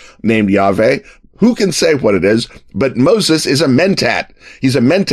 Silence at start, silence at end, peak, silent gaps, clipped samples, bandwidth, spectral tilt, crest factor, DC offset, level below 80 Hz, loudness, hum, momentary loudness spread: 0.25 s; 0 s; 0 dBFS; none; under 0.1%; 14 kHz; -5 dB/octave; 12 dB; under 0.1%; -46 dBFS; -13 LUFS; none; 7 LU